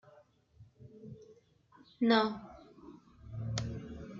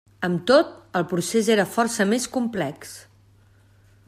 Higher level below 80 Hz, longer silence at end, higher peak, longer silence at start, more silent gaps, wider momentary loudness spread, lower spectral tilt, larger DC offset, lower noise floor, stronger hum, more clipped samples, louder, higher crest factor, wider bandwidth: about the same, -60 dBFS vs -62 dBFS; second, 0 s vs 1.05 s; second, -14 dBFS vs -6 dBFS; second, 0.05 s vs 0.2 s; neither; first, 27 LU vs 13 LU; about the same, -5.5 dB/octave vs -4.5 dB/octave; neither; first, -64 dBFS vs -55 dBFS; neither; neither; second, -34 LUFS vs -22 LUFS; first, 24 dB vs 18 dB; second, 7.6 kHz vs 15.5 kHz